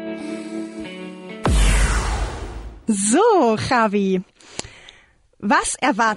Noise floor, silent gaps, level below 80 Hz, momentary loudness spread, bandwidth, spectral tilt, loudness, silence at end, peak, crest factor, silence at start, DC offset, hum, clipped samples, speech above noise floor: -53 dBFS; none; -26 dBFS; 18 LU; 12.5 kHz; -4.5 dB/octave; -20 LUFS; 0 s; -4 dBFS; 16 dB; 0 s; under 0.1%; none; under 0.1%; 36 dB